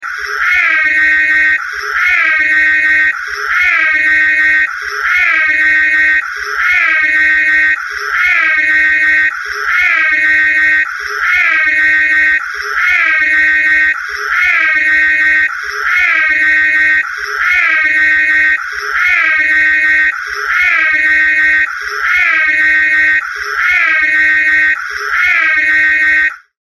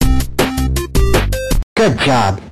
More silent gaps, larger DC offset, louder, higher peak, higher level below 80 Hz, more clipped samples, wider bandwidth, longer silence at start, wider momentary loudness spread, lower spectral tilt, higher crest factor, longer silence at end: second, none vs 1.63-1.76 s; neither; first, -9 LUFS vs -15 LUFS; about the same, 0 dBFS vs 0 dBFS; second, -44 dBFS vs -18 dBFS; neither; second, 12.5 kHz vs 15 kHz; about the same, 0 s vs 0 s; about the same, 6 LU vs 5 LU; second, -0.5 dB/octave vs -5 dB/octave; about the same, 12 dB vs 14 dB; first, 0.35 s vs 0 s